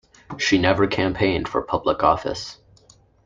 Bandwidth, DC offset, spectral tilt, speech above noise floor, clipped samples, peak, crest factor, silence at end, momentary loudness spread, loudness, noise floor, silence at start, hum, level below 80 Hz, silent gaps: 7.6 kHz; under 0.1%; -5 dB/octave; 34 dB; under 0.1%; -2 dBFS; 20 dB; 0.7 s; 13 LU; -21 LUFS; -54 dBFS; 0.3 s; none; -46 dBFS; none